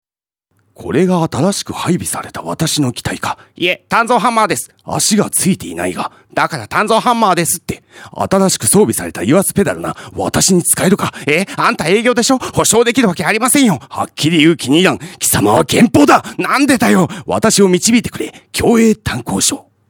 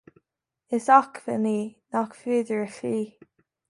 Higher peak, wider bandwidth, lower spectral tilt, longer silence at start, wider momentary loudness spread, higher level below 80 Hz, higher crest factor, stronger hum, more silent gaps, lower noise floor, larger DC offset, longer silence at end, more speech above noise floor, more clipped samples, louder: first, 0 dBFS vs -4 dBFS; first, 19.5 kHz vs 11.5 kHz; second, -4 dB/octave vs -6 dB/octave; about the same, 0.8 s vs 0.7 s; about the same, 10 LU vs 12 LU; first, -44 dBFS vs -76 dBFS; second, 14 dB vs 22 dB; neither; neither; second, -72 dBFS vs -82 dBFS; neither; second, 0.3 s vs 0.6 s; about the same, 59 dB vs 58 dB; neither; first, -13 LUFS vs -25 LUFS